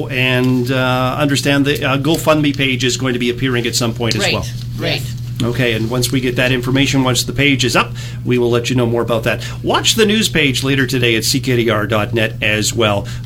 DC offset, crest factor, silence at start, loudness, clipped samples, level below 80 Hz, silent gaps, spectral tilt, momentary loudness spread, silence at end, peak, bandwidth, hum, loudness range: under 0.1%; 16 dB; 0 s; -15 LUFS; under 0.1%; -36 dBFS; none; -4.5 dB/octave; 6 LU; 0 s; 0 dBFS; 17 kHz; none; 3 LU